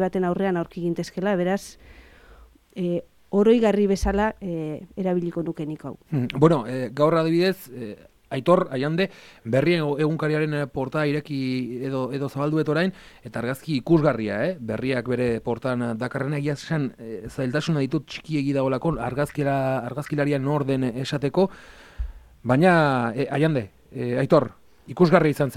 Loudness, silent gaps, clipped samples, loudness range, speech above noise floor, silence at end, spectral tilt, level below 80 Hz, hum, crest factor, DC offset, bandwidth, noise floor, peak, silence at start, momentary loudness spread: -24 LUFS; none; under 0.1%; 3 LU; 28 dB; 0 s; -7 dB/octave; -46 dBFS; none; 20 dB; under 0.1%; 16 kHz; -51 dBFS; -2 dBFS; 0 s; 12 LU